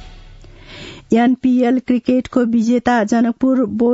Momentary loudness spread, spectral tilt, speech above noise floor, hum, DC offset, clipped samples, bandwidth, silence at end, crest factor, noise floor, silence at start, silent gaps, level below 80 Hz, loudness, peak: 4 LU; -6.5 dB/octave; 24 dB; none; under 0.1%; under 0.1%; 7.8 kHz; 0 s; 14 dB; -39 dBFS; 0 s; none; -46 dBFS; -15 LUFS; -2 dBFS